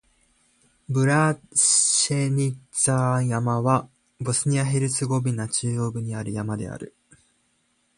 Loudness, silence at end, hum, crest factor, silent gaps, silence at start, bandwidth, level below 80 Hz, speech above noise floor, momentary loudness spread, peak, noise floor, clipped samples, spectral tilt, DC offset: -22 LUFS; 1.1 s; none; 18 dB; none; 0.9 s; 11.5 kHz; -58 dBFS; 45 dB; 13 LU; -6 dBFS; -68 dBFS; under 0.1%; -4 dB/octave; under 0.1%